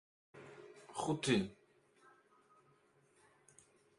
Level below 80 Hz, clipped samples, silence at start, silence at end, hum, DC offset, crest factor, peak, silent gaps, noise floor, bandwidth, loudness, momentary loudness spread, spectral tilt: -74 dBFS; under 0.1%; 0.35 s; 2.45 s; none; under 0.1%; 24 dB; -20 dBFS; none; -72 dBFS; 11.5 kHz; -38 LUFS; 23 LU; -5 dB/octave